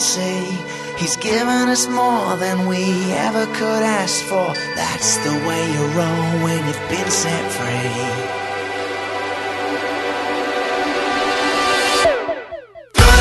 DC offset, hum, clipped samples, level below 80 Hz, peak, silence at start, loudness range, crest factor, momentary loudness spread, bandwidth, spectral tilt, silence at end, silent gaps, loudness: under 0.1%; none; under 0.1%; -28 dBFS; 0 dBFS; 0 s; 3 LU; 18 dB; 8 LU; 12.5 kHz; -3.5 dB/octave; 0 s; none; -18 LUFS